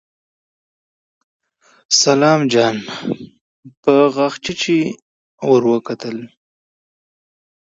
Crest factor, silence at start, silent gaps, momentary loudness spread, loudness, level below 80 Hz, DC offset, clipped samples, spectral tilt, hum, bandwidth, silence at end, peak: 18 dB; 1.9 s; 3.41-3.63 s, 3.77-3.83 s, 5.02-5.38 s; 13 LU; -16 LUFS; -62 dBFS; under 0.1%; under 0.1%; -4 dB/octave; none; 8 kHz; 1.4 s; 0 dBFS